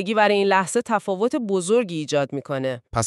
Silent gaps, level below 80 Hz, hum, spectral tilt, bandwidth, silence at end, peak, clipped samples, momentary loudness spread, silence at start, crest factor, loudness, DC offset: none; -54 dBFS; none; -4.5 dB/octave; 12.5 kHz; 0 s; -4 dBFS; under 0.1%; 8 LU; 0 s; 18 dB; -22 LUFS; under 0.1%